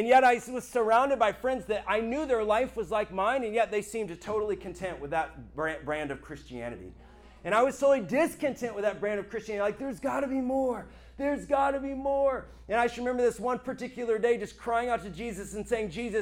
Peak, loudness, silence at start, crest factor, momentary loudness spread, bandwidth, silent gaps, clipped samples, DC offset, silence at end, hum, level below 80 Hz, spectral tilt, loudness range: -12 dBFS; -29 LUFS; 0 s; 18 dB; 12 LU; 16.5 kHz; none; under 0.1%; under 0.1%; 0 s; none; -54 dBFS; -5 dB/octave; 5 LU